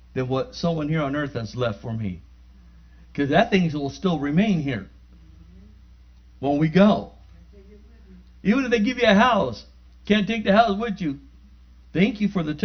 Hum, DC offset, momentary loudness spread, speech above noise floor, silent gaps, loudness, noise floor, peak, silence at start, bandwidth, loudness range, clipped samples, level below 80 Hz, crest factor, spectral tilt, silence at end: 60 Hz at -45 dBFS; under 0.1%; 13 LU; 28 dB; none; -22 LUFS; -49 dBFS; -2 dBFS; 0.15 s; 6.6 kHz; 4 LU; under 0.1%; -46 dBFS; 20 dB; -7 dB/octave; 0 s